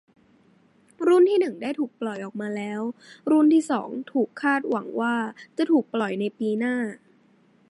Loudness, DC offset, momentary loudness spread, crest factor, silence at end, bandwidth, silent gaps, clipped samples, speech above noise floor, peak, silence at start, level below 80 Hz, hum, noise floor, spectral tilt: -24 LUFS; under 0.1%; 13 LU; 14 dB; 0.75 s; 11.5 kHz; none; under 0.1%; 36 dB; -10 dBFS; 1 s; -80 dBFS; none; -60 dBFS; -6 dB/octave